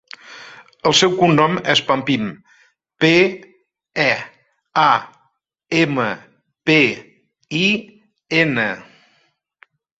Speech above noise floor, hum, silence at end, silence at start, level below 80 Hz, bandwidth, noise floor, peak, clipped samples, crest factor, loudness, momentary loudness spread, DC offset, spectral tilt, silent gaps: 49 dB; none; 1.2 s; 0.3 s; -58 dBFS; 8 kHz; -65 dBFS; 0 dBFS; under 0.1%; 20 dB; -17 LUFS; 18 LU; under 0.1%; -4.5 dB/octave; none